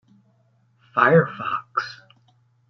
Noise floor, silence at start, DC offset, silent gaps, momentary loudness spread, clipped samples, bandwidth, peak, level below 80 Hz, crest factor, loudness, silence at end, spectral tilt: -62 dBFS; 0.95 s; under 0.1%; none; 12 LU; under 0.1%; 6.4 kHz; -2 dBFS; -70 dBFS; 22 dB; -21 LUFS; 0.75 s; -7.5 dB/octave